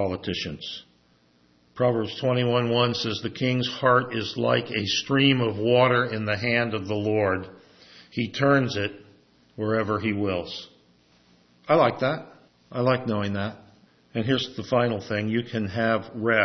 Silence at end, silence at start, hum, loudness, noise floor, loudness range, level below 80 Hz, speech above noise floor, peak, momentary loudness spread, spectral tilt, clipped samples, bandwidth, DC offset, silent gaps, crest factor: 0 s; 0 s; none; -24 LUFS; -62 dBFS; 5 LU; -62 dBFS; 38 dB; -6 dBFS; 11 LU; -6 dB/octave; under 0.1%; 6.4 kHz; under 0.1%; none; 20 dB